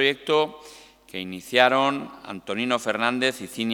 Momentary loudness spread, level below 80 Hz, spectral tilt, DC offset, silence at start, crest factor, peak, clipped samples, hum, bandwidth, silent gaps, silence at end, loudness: 18 LU; -66 dBFS; -3.5 dB/octave; under 0.1%; 0 s; 24 dB; -2 dBFS; under 0.1%; none; 19 kHz; none; 0 s; -23 LUFS